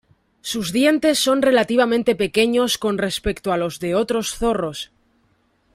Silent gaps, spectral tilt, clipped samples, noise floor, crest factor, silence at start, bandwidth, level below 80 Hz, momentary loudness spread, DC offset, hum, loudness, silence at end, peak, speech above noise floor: none; -4 dB/octave; under 0.1%; -63 dBFS; 16 dB; 0.45 s; 16 kHz; -44 dBFS; 10 LU; under 0.1%; none; -19 LUFS; 0.9 s; -4 dBFS; 44 dB